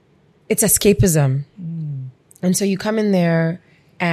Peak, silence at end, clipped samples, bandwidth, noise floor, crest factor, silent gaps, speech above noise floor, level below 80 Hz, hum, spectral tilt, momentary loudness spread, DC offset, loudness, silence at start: -2 dBFS; 0 s; under 0.1%; 15.5 kHz; -54 dBFS; 16 dB; none; 37 dB; -42 dBFS; none; -5 dB/octave; 16 LU; under 0.1%; -18 LUFS; 0.5 s